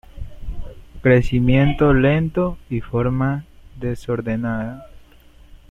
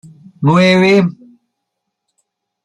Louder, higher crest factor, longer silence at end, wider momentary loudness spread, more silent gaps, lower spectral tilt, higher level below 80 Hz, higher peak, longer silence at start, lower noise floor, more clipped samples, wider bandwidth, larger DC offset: second, -19 LUFS vs -11 LUFS; about the same, 18 dB vs 14 dB; second, 0.15 s vs 1.55 s; first, 20 LU vs 9 LU; neither; first, -9 dB/octave vs -6.5 dB/octave; first, -32 dBFS vs -56 dBFS; about the same, -2 dBFS vs -2 dBFS; second, 0.15 s vs 0.4 s; second, -47 dBFS vs -75 dBFS; neither; second, 7.8 kHz vs 10.5 kHz; neither